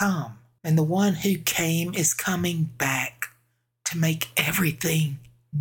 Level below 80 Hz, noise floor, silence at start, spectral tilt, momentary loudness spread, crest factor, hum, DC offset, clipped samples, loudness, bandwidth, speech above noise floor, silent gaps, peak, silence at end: -58 dBFS; -69 dBFS; 0 s; -4 dB/octave; 11 LU; 20 dB; none; under 0.1%; under 0.1%; -24 LUFS; 19.5 kHz; 45 dB; none; -6 dBFS; 0 s